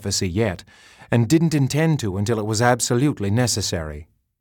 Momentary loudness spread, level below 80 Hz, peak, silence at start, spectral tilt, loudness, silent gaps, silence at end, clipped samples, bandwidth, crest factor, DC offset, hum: 8 LU; -46 dBFS; -4 dBFS; 0 s; -5 dB/octave; -20 LUFS; none; 0.35 s; under 0.1%; 18.5 kHz; 18 dB; under 0.1%; none